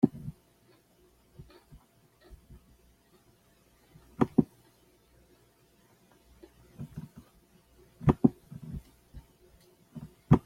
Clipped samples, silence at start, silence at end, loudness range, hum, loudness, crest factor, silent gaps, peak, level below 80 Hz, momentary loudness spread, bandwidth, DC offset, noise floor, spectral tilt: under 0.1%; 0.05 s; 0.05 s; 18 LU; 60 Hz at -65 dBFS; -31 LUFS; 28 dB; none; -6 dBFS; -52 dBFS; 28 LU; 15 kHz; under 0.1%; -65 dBFS; -9.5 dB/octave